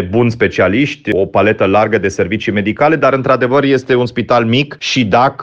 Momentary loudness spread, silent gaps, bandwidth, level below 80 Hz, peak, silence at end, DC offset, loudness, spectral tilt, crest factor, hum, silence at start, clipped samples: 4 LU; none; 8.4 kHz; -46 dBFS; 0 dBFS; 0 s; under 0.1%; -13 LUFS; -6 dB/octave; 12 dB; none; 0 s; under 0.1%